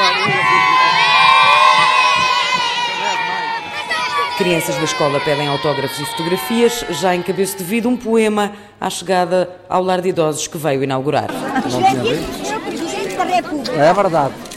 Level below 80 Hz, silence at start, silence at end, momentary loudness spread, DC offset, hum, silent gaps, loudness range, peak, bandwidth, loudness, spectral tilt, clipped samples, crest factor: -50 dBFS; 0 s; 0 s; 11 LU; under 0.1%; none; none; 6 LU; 0 dBFS; 16 kHz; -15 LUFS; -3.5 dB/octave; under 0.1%; 16 dB